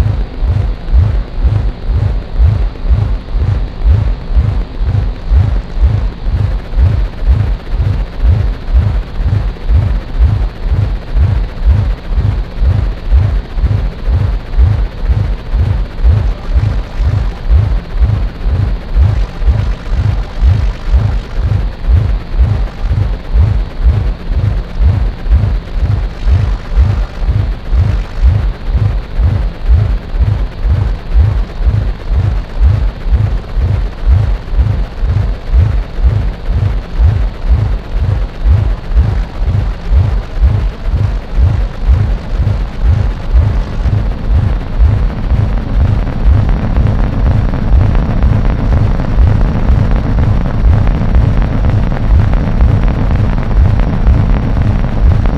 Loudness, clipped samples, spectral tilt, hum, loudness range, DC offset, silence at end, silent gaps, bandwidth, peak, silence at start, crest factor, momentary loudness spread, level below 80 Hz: -14 LUFS; under 0.1%; -8.5 dB/octave; none; 2 LU; under 0.1%; 0 s; none; 6 kHz; 0 dBFS; 0 s; 10 dB; 4 LU; -12 dBFS